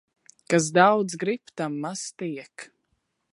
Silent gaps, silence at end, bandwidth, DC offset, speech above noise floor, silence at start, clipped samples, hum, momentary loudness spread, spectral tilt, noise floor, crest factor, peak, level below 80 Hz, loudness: none; 0.7 s; 11.5 kHz; under 0.1%; 50 dB; 0.5 s; under 0.1%; none; 18 LU; -4.5 dB/octave; -75 dBFS; 24 dB; -2 dBFS; -74 dBFS; -24 LUFS